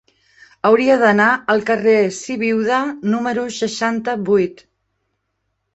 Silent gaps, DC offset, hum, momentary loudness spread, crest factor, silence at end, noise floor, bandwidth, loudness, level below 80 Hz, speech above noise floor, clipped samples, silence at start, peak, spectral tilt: none; under 0.1%; none; 9 LU; 16 dB; 1.2 s; -72 dBFS; 8.2 kHz; -17 LUFS; -60 dBFS; 56 dB; under 0.1%; 0.65 s; -2 dBFS; -5 dB/octave